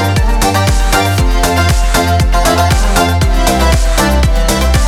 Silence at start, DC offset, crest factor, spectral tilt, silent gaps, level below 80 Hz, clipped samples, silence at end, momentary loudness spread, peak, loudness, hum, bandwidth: 0 s; under 0.1%; 10 dB; -4.5 dB/octave; none; -12 dBFS; under 0.1%; 0 s; 1 LU; 0 dBFS; -11 LUFS; none; 16.5 kHz